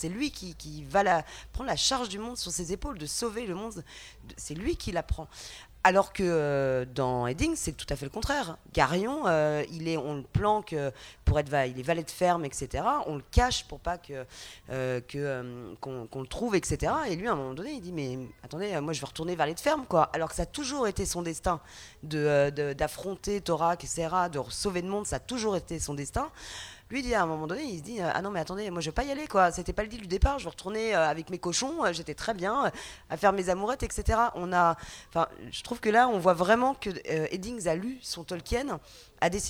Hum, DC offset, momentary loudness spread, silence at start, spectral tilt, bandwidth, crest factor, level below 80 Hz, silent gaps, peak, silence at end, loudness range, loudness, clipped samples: none; under 0.1%; 12 LU; 0 s; -4.5 dB/octave; over 20 kHz; 24 dB; -42 dBFS; none; -6 dBFS; 0 s; 5 LU; -30 LUFS; under 0.1%